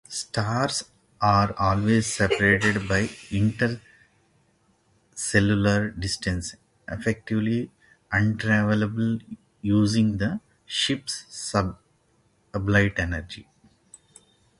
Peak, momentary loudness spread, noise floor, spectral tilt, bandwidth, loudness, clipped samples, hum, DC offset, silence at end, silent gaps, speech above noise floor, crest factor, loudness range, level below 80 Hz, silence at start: -4 dBFS; 12 LU; -65 dBFS; -5 dB/octave; 11.5 kHz; -24 LUFS; under 0.1%; none; under 0.1%; 1.15 s; none; 41 dB; 20 dB; 4 LU; -44 dBFS; 0.1 s